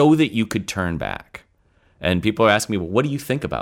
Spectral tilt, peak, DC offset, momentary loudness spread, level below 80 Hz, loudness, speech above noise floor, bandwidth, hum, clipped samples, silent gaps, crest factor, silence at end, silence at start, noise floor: -5.5 dB/octave; -2 dBFS; under 0.1%; 11 LU; -46 dBFS; -21 LUFS; 40 dB; 17 kHz; none; under 0.1%; none; 18 dB; 0 s; 0 s; -59 dBFS